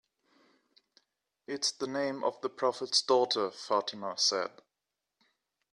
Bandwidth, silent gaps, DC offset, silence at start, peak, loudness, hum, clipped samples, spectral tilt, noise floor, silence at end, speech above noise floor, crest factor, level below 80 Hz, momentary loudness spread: 13 kHz; none; under 0.1%; 1.5 s; -12 dBFS; -31 LUFS; none; under 0.1%; -1.5 dB/octave; -88 dBFS; 1.25 s; 56 dB; 22 dB; -84 dBFS; 9 LU